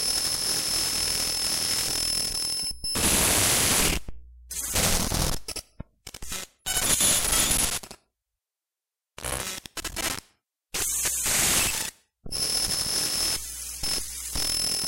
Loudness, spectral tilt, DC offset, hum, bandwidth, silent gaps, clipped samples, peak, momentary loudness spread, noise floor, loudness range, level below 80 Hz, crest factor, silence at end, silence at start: -24 LUFS; -1 dB/octave; under 0.1%; none; 17 kHz; none; under 0.1%; -8 dBFS; 14 LU; -90 dBFS; 5 LU; -40 dBFS; 18 dB; 0 s; 0 s